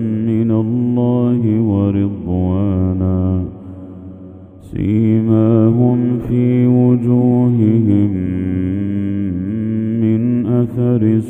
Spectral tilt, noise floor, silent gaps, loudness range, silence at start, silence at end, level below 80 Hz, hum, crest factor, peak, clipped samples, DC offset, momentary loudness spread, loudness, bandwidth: -11.5 dB/octave; -35 dBFS; none; 5 LU; 0 s; 0 s; -42 dBFS; none; 14 dB; 0 dBFS; under 0.1%; under 0.1%; 8 LU; -15 LUFS; 3.6 kHz